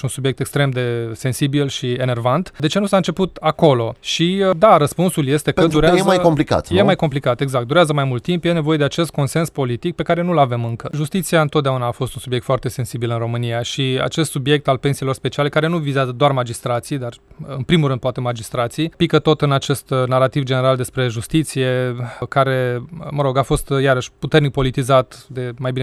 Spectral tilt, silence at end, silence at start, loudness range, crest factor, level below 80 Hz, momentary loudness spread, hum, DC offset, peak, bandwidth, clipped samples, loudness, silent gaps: -6 dB/octave; 0 s; 0.05 s; 5 LU; 18 dB; -42 dBFS; 8 LU; none; under 0.1%; 0 dBFS; 13.5 kHz; under 0.1%; -18 LUFS; none